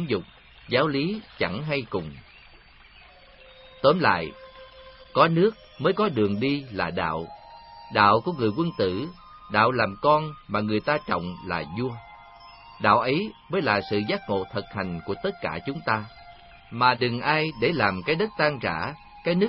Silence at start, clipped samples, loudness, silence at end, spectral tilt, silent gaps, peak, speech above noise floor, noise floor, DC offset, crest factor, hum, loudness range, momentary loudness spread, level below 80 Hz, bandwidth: 0 s; under 0.1%; -25 LUFS; 0 s; -10.5 dB/octave; none; -4 dBFS; 27 dB; -51 dBFS; under 0.1%; 22 dB; none; 4 LU; 12 LU; -54 dBFS; 5.8 kHz